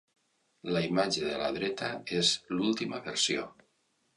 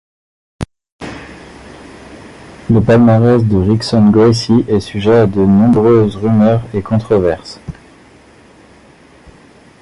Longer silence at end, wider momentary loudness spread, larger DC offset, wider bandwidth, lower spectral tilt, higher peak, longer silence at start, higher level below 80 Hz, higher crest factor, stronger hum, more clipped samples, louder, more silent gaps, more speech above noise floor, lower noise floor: second, 0.65 s vs 2.1 s; second, 8 LU vs 21 LU; neither; about the same, 11.5 kHz vs 11.5 kHz; second, -3.5 dB/octave vs -8 dB/octave; second, -12 dBFS vs 0 dBFS; about the same, 0.65 s vs 0.6 s; second, -66 dBFS vs -36 dBFS; first, 20 dB vs 12 dB; neither; neither; second, -30 LUFS vs -11 LUFS; second, none vs 0.92-0.99 s; first, 43 dB vs 32 dB; first, -74 dBFS vs -43 dBFS